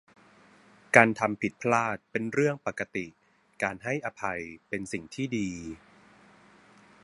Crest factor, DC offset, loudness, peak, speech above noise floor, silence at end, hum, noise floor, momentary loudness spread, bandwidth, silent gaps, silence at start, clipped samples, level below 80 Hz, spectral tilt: 30 dB; under 0.1%; -28 LUFS; 0 dBFS; 29 dB; 1.3 s; none; -58 dBFS; 16 LU; 11.5 kHz; none; 0.95 s; under 0.1%; -64 dBFS; -5.5 dB/octave